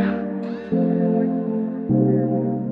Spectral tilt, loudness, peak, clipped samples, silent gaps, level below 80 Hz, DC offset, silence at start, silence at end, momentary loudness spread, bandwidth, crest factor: -11.5 dB/octave; -21 LUFS; -6 dBFS; under 0.1%; none; -56 dBFS; under 0.1%; 0 s; 0 s; 7 LU; 4.8 kHz; 14 dB